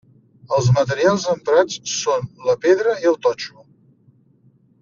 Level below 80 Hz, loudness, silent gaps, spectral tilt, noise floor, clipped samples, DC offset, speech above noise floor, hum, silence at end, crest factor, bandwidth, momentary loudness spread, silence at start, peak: -56 dBFS; -19 LUFS; none; -5 dB/octave; -55 dBFS; under 0.1%; under 0.1%; 38 dB; none; 1.35 s; 18 dB; 7.4 kHz; 6 LU; 0.5 s; -2 dBFS